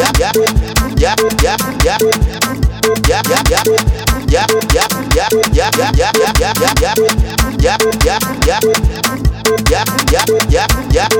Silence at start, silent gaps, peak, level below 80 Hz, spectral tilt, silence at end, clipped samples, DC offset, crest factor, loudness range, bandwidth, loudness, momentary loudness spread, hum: 0 s; none; 0 dBFS; -18 dBFS; -4 dB/octave; 0 s; under 0.1%; under 0.1%; 12 dB; 1 LU; 19.5 kHz; -12 LUFS; 3 LU; none